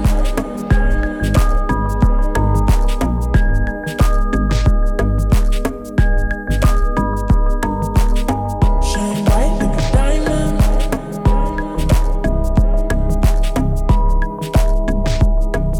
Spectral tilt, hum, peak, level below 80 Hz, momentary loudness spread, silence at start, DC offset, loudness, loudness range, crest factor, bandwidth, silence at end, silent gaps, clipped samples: -6.5 dB/octave; none; -2 dBFS; -16 dBFS; 4 LU; 0 s; under 0.1%; -18 LUFS; 1 LU; 10 dB; 14.5 kHz; 0 s; none; under 0.1%